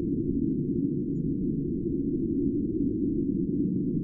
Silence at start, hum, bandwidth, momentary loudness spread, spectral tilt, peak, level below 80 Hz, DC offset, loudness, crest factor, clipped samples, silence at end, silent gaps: 0 s; none; 0.7 kHz; 2 LU; -16 dB/octave; -16 dBFS; -44 dBFS; under 0.1%; -29 LUFS; 12 dB; under 0.1%; 0 s; none